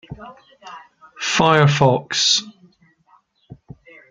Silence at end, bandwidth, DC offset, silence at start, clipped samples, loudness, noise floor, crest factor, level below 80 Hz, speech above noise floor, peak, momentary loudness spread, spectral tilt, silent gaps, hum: 0.55 s; 9.4 kHz; under 0.1%; 0.1 s; under 0.1%; -16 LUFS; -58 dBFS; 20 dB; -54 dBFS; 40 dB; 0 dBFS; 26 LU; -4 dB/octave; none; none